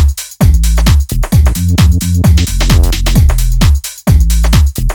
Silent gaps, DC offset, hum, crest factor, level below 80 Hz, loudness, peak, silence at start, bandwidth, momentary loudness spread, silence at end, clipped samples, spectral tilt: none; under 0.1%; none; 8 dB; -10 dBFS; -11 LUFS; 0 dBFS; 0 s; over 20 kHz; 3 LU; 0 s; under 0.1%; -5.5 dB/octave